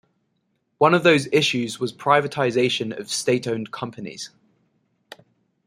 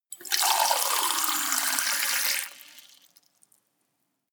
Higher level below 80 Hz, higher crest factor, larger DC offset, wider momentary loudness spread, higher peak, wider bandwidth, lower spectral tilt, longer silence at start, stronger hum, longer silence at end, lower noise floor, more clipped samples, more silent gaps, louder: first, -66 dBFS vs under -90 dBFS; about the same, 20 dB vs 24 dB; neither; first, 16 LU vs 6 LU; about the same, -2 dBFS vs -4 dBFS; second, 15.5 kHz vs over 20 kHz; first, -4.5 dB/octave vs 4 dB/octave; first, 0.8 s vs 0.1 s; neither; about the same, 1.4 s vs 1.5 s; second, -71 dBFS vs -77 dBFS; neither; neither; first, -21 LUFS vs -24 LUFS